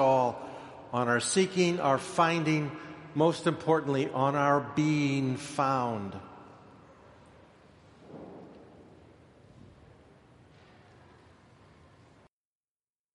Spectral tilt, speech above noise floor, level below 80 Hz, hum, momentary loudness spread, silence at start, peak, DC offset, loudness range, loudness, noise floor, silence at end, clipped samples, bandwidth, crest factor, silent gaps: -5.5 dB/octave; over 62 dB; -68 dBFS; none; 21 LU; 0 s; -10 dBFS; under 0.1%; 9 LU; -28 LUFS; under -90 dBFS; 4.55 s; under 0.1%; 11.5 kHz; 20 dB; none